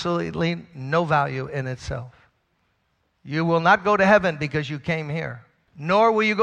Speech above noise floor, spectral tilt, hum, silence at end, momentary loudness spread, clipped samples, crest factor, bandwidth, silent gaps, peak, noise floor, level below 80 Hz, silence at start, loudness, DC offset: 48 dB; -6.5 dB/octave; none; 0 s; 15 LU; under 0.1%; 20 dB; 9.2 kHz; none; -4 dBFS; -70 dBFS; -50 dBFS; 0 s; -22 LUFS; under 0.1%